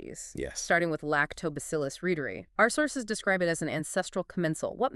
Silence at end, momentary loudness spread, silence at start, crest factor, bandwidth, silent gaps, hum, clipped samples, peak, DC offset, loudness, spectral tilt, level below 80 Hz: 0 s; 9 LU; 0 s; 22 dB; 13.5 kHz; none; none; under 0.1%; -8 dBFS; under 0.1%; -30 LUFS; -4 dB/octave; -56 dBFS